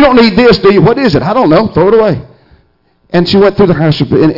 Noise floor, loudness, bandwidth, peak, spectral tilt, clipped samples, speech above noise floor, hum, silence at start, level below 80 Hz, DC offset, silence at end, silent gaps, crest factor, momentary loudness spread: -52 dBFS; -7 LUFS; 5.8 kHz; 0 dBFS; -8 dB/octave; under 0.1%; 45 dB; none; 0 s; -32 dBFS; under 0.1%; 0 s; none; 8 dB; 6 LU